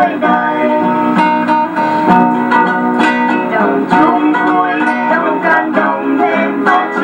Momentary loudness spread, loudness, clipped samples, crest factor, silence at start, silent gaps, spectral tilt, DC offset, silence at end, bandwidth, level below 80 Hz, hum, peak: 3 LU; -12 LUFS; under 0.1%; 12 dB; 0 s; none; -6.5 dB/octave; under 0.1%; 0 s; 16.5 kHz; -56 dBFS; none; 0 dBFS